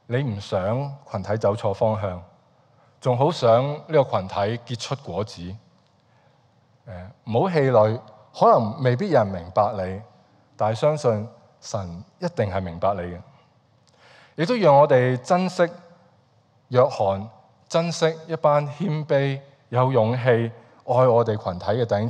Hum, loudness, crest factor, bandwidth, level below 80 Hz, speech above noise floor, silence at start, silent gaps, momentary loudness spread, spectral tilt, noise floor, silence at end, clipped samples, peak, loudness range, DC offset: none; -22 LUFS; 18 dB; 9.8 kHz; -60 dBFS; 39 dB; 0.1 s; none; 15 LU; -7 dB/octave; -60 dBFS; 0 s; under 0.1%; -4 dBFS; 6 LU; under 0.1%